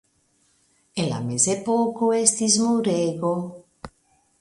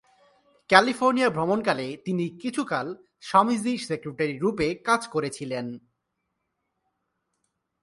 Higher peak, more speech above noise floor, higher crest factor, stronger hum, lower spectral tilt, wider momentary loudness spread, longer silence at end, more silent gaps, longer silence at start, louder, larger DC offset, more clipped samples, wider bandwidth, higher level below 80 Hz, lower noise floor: about the same, -2 dBFS vs -2 dBFS; second, 43 dB vs 55 dB; about the same, 22 dB vs 26 dB; neither; about the same, -4 dB/octave vs -5 dB/octave; about the same, 11 LU vs 13 LU; second, 0.55 s vs 2.05 s; neither; first, 0.95 s vs 0.7 s; first, -21 LUFS vs -25 LUFS; neither; neither; about the same, 11.5 kHz vs 11.5 kHz; about the same, -62 dBFS vs -62 dBFS; second, -65 dBFS vs -79 dBFS